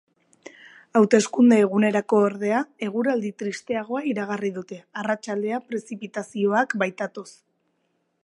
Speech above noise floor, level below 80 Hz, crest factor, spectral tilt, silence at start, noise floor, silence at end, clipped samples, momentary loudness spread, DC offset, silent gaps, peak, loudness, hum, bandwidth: 49 dB; -76 dBFS; 20 dB; -5.5 dB/octave; 0.95 s; -72 dBFS; 0.95 s; under 0.1%; 15 LU; under 0.1%; none; -4 dBFS; -23 LUFS; none; 11 kHz